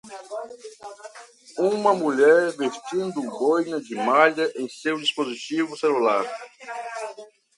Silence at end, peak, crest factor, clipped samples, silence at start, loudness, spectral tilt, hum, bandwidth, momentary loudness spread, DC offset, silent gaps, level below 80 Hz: 0.35 s; -4 dBFS; 20 dB; under 0.1%; 0.05 s; -23 LUFS; -4 dB/octave; none; 11.5 kHz; 20 LU; under 0.1%; none; -76 dBFS